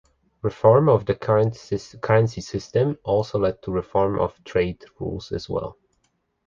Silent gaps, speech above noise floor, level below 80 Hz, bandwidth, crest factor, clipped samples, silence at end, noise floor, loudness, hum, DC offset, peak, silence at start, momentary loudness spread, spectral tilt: none; 48 dB; -46 dBFS; 7.4 kHz; 20 dB; under 0.1%; 0.75 s; -70 dBFS; -23 LUFS; none; under 0.1%; -2 dBFS; 0.45 s; 14 LU; -7.5 dB/octave